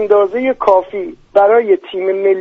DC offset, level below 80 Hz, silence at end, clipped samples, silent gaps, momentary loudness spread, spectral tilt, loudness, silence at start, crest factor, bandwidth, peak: under 0.1%; -52 dBFS; 0 s; under 0.1%; none; 8 LU; -6.5 dB/octave; -13 LUFS; 0 s; 12 dB; 5.8 kHz; 0 dBFS